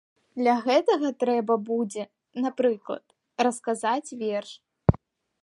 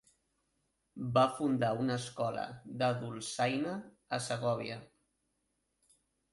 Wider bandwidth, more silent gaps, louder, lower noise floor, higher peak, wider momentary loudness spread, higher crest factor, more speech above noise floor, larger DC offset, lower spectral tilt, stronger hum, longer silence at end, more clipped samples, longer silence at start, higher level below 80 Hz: about the same, 11.5 kHz vs 11.5 kHz; neither; first, -26 LUFS vs -35 LUFS; second, -48 dBFS vs -81 dBFS; first, -2 dBFS vs -14 dBFS; about the same, 15 LU vs 13 LU; about the same, 24 dB vs 22 dB; second, 23 dB vs 47 dB; neither; about the same, -6 dB/octave vs -5.5 dB/octave; neither; second, 0.45 s vs 1.5 s; neither; second, 0.35 s vs 0.95 s; first, -46 dBFS vs -72 dBFS